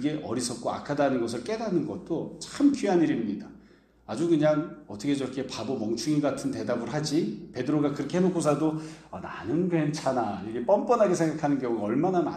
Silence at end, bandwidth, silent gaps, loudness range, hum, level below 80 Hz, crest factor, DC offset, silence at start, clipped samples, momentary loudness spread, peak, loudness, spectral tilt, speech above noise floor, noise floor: 0 s; 12.5 kHz; none; 2 LU; none; -62 dBFS; 18 dB; under 0.1%; 0 s; under 0.1%; 10 LU; -10 dBFS; -27 LUFS; -6 dB/octave; 28 dB; -55 dBFS